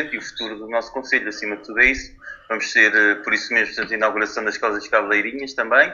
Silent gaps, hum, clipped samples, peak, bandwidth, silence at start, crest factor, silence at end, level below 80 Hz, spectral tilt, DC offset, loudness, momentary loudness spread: none; none; under 0.1%; 0 dBFS; 7.4 kHz; 0 s; 20 dB; 0 s; -48 dBFS; -2.5 dB/octave; under 0.1%; -19 LUFS; 13 LU